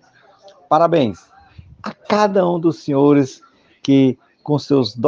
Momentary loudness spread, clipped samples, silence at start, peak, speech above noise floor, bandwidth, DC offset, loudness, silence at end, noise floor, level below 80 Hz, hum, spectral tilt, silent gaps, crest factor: 15 LU; under 0.1%; 0.7 s; 0 dBFS; 33 dB; 7.4 kHz; under 0.1%; -17 LUFS; 0 s; -48 dBFS; -60 dBFS; none; -7 dB/octave; none; 16 dB